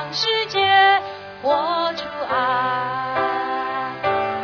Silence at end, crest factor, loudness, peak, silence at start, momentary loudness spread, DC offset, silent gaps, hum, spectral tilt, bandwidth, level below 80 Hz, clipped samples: 0 s; 18 dB; -20 LUFS; -2 dBFS; 0 s; 10 LU; under 0.1%; none; none; -3.5 dB/octave; 5.4 kHz; -60 dBFS; under 0.1%